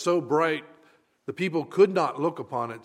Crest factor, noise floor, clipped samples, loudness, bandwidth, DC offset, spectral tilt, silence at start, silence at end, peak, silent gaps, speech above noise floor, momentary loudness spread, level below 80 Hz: 18 dB; -61 dBFS; under 0.1%; -25 LUFS; 11.5 kHz; under 0.1%; -6 dB/octave; 0 s; 0.05 s; -8 dBFS; none; 36 dB; 12 LU; -78 dBFS